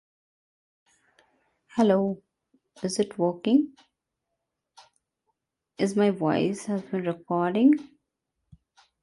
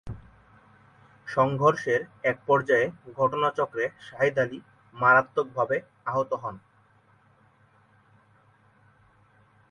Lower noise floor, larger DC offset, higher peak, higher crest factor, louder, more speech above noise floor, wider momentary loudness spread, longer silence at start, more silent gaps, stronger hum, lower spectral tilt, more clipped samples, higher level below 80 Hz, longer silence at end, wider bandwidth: first, -83 dBFS vs -61 dBFS; neither; about the same, -8 dBFS vs -8 dBFS; about the same, 20 dB vs 20 dB; about the same, -26 LUFS vs -25 LUFS; first, 59 dB vs 36 dB; about the same, 10 LU vs 11 LU; first, 1.75 s vs 0.05 s; neither; neither; about the same, -6.5 dB/octave vs -6.5 dB/octave; neither; second, -70 dBFS vs -60 dBFS; second, 1.2 s vs 3.1 s; about the same, 11.5 kHz vs 10.5 kHz